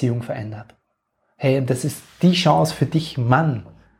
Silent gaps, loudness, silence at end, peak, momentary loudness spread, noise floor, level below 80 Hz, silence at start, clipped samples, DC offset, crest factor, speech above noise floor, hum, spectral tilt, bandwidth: none; -20 LUFS; 0.35 s; -2 dBFS; 13 LU; -71 dBFS; -54 dBFS; 0 s; under 0.1%; under 0.1%; 20 dB; 51 dB; none; -6 dB/octave; 16 kHz